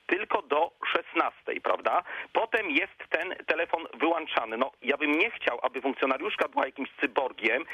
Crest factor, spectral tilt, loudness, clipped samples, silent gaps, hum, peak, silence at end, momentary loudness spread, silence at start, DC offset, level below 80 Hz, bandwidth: 20 dB; -4 dB/octave; -28 LUFS; under 0.1%; none; none; -10 dBFS; 0 s; 5 LU; 0.1 s; under 0.1%; -72 dBFS; 13.5 kHz